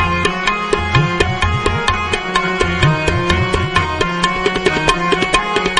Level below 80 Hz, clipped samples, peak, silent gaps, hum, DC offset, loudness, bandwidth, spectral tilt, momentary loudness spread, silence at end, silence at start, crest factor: -28 dBFS; under 0.1%; 0 dBFS; none; none; 0.1%; -15 LUFS; 10.5 kHz; -4.5 dB/octave; 3 LU; 0 s; 0 s; 16 dB